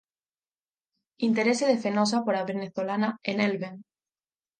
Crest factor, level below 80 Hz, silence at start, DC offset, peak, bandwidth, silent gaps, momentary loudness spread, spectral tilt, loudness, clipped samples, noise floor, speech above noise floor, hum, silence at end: 18 dB; -78 dBFS; 1.2 s; under 0.1%; -10 dBFS; 9.6 kHz; none; 8 LU; -5 dB/octave; -27 LUFS; under 0.1%; under -90 dBFS; over 64 dB; none; 0.8 s